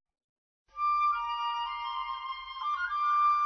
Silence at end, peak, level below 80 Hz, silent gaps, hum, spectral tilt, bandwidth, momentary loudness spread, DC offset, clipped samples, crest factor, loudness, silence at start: 0 s; -20 dBFS; -64 dBFS; none; none; 1.5 dB/octave; 6.2 kHz; 10 LU; under 0.1%; under 0.1%; 12 dB; -31 LUFS; 0.75 s